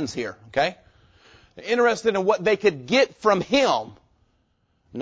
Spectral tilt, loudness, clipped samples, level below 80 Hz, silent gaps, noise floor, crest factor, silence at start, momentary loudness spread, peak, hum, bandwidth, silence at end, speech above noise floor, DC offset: -4.5 dB/octave; -22 LUFS; under 0.1%; -58 dBFS; none; -68 dBFS; 18 dB; 0 s; 11 LU; -6 dBFS; none; 8 kHz; 0 s; 46 dB; under 0.1%